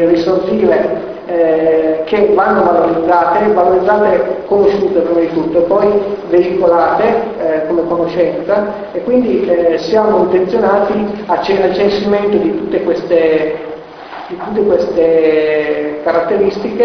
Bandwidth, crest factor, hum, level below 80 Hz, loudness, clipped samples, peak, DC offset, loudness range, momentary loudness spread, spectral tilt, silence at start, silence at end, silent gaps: 6.4 kHz; 12 dB; none; -44 dBFS; -12 LUFS; under 0.1%; 0 dBFS; under 0.1%; 3 LU; 6 LU; -7.5 dB/octave; 0 s; 0 s; none